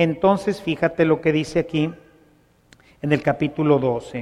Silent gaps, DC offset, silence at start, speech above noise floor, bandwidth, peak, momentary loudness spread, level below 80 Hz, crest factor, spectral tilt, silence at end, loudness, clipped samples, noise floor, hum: none; under 0.1%; 0 s; 36 dB; 11.5 kHz; -4 dBFS; 6 LU; -52 dBFS; 18 dB; -7 dB/octave; 0 s; -21 LUFS; under 0.1%; -57 dBFS; none